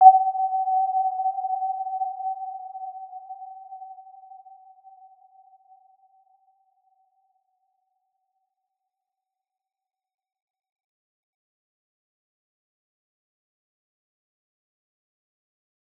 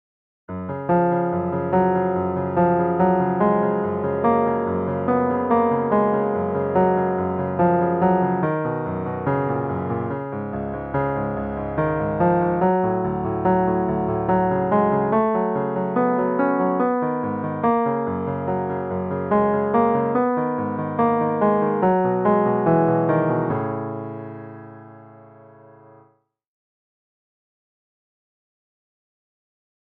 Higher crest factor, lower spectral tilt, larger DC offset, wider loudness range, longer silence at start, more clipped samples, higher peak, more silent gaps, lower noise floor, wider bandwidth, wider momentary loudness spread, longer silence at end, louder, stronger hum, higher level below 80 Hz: first, 28 dB vs 16 dB; second, -4.5 dB/octave vs -12 dB/octave; neither; first, 23 LU vs 4 LU; second, 0 s vs 0.5 s; neither; first, -2 dBFS vs -6 dBFS; neither; first, -89 dBFS vs -60 dBFS; second, 1.2 kHz vs 3.9 kHz; first, 22 LU vs 7 LU; first, 11.6 s vs 4.75 s; second, -25 LUFS vs -21 LUFS; neither; second, under -90 dBFS vs -50 dBFS